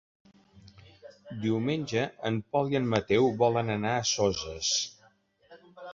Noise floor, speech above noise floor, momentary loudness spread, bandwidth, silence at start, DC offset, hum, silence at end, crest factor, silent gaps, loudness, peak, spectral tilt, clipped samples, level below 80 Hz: -64 dBFS; 36 dB; 8 LU; 7.8 kHz; 0.55 s; under 0.1%; none; 0 s; 22 dB; none; -28 LUFS; -8 dBFS; -4 dB/octave; under 0.1%; -58 dBFS